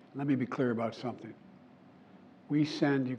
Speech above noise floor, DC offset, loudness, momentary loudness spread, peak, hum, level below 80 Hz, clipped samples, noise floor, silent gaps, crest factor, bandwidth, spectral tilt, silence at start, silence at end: 25 dB; under 0.1%; -32 LUFS; 13 LU; -16 dBFS; none; -86 dBFS; under 0.1%; -57 dBFS; none; 18 dB; 8.2 kHz; -7.5 dB/octave; 0.15 s; 0 s